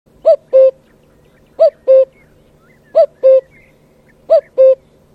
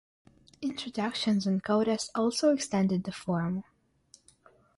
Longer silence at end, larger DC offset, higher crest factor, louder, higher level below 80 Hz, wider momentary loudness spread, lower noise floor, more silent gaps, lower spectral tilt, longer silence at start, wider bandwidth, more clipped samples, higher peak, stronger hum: second, 0.4 s vs 1.15 s; neither; about the same, 12 dB vs 16 dB; first, -12 LUFS vs -30 LUFS; first, -58 dBFS vs -66 dBFS; second, 4 LU vs 9 LU; second, -49 dBFS vs -62 dBFS; neither; about the same, -5.5 dB/octave vs -5.5 dB/octave; second, 0.25 s vs 0.6 s; second, 4.9 kHz vs 11.5 kHz; neither; first, 0 dBFS vs -14 dBFS; neither